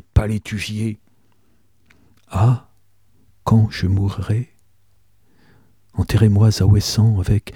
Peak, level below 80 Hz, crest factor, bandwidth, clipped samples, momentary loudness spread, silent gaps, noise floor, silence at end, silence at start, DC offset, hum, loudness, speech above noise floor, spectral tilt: -2 dBFS; -34 dBFS; 16 dB; 14 kHz; under 0.1%; 13 LU; none; -62 dBFS; 0.05 s; 0.15 s; 0.2%; none; -18 LUFS; 45 dB; -6.5 dB/octave